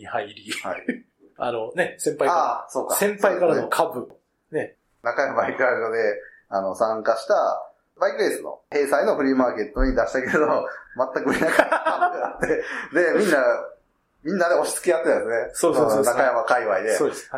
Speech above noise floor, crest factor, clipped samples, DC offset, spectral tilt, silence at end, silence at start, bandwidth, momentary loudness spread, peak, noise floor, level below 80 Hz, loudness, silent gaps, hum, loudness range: 40 dB; 20 dB; under 0.1%; under 0.1%; -4 dB/octave; 0 s; 0 s; 16 kHz; 11 LU; -2 dBFS; -62 dBFS; -42 dBFS; -22 LUFS; none; none; 3 LU